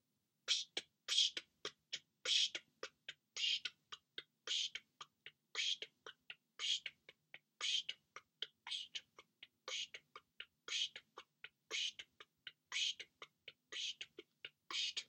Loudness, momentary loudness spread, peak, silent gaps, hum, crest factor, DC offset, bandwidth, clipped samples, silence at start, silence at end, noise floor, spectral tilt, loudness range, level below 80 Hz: -42 LUFS; 21 LU; -20 dBFS; none; none; 26 dB; under 0.1%; 16 kHz; under 0.1%; 0.45 s; 0.05 s; -65 dBFS; 2.5 dB/octave; 7 LU; under -90 dBFS